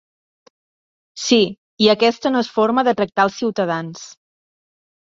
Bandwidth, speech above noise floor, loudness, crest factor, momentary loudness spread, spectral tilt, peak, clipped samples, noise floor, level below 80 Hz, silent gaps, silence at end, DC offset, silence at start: 7.8 kHz; over 73 dB; -18 LUFS; 18 dB; 11 LU; -4 dB/octave; -2 dBFS; under 0.1%; under -90 dBFS; -62 dBFS; 1.58-1.77 s; 0.95 s; under 0.1%; 1.15 s